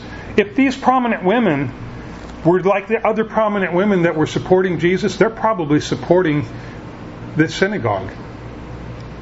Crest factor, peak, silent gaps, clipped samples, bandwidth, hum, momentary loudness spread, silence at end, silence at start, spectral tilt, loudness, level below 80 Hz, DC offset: 18 dB; 0 dBFS; none; under 0.1%; 8 kHz; none; 17 LU; 0 s; 0 s; -6.5 dB/octave; -17 LUFS; -42 dBFS; under 0.1%